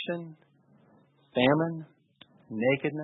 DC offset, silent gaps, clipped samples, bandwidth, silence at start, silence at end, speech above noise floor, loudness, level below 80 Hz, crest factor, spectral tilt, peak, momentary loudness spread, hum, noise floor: under 0.1%; none; under 0.1%; 4.1 kHz; 0 s; 0 s; 35 dB; -28 LUFS; -68 dBFS; 22 dB; -10 dB/octave; -8 dBFS; 17 LU; none; -62 dBFS